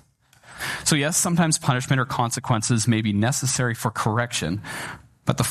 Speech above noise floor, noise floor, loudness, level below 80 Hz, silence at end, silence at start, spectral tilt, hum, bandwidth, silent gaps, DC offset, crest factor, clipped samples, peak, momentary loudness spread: 32 dB; -54 dBFS; -23 LUFS; -54 dBFS; 0 s; 0.5 s; -4 dB/octave; none; 14 kHz; none; under 0.1%; 20 dB; under 0.1%; -4 dBFS; 10 LU